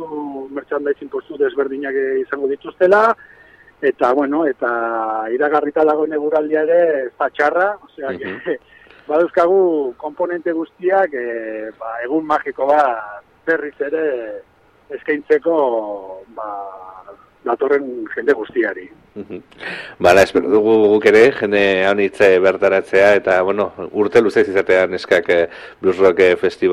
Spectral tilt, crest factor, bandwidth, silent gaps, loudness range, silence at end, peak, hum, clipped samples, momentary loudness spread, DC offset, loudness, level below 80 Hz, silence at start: -5.5 dB/octave; 16 dB; 13 kHz; none; 8 LU; 0 s; 0 dBFS; none; under 0.1%; 15 LU; under 0.1%; -16 LUFS; -56 dBFS; 0 s